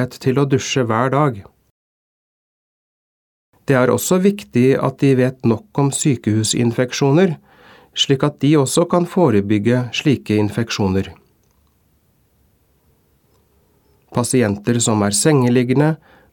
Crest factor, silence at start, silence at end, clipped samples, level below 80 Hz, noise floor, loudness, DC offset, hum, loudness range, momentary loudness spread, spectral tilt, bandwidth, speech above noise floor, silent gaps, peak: 18 dB; 0 s; 0.35 s; under 0.1%; -56 dBFS; -59 dBFS; -16 LUFS; under 0.1%; none; 8 LU; 5 LU; -5.5 dB/octave; 18 kHz; 43 dB; 1.71-3.53 s; 0 dBFS